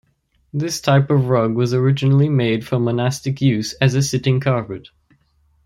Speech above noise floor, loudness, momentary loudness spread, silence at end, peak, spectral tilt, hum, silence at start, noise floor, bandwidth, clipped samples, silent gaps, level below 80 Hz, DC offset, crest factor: 46 dB; -18 LUFS; 8 LU; 0.85 s; -2 dBFS; -6.5 dB/octave; none; 0.55 s; -63 dBFS; 13 kHz; under 0.1%; none; -52 dBFS; under 0.1%; 16 dB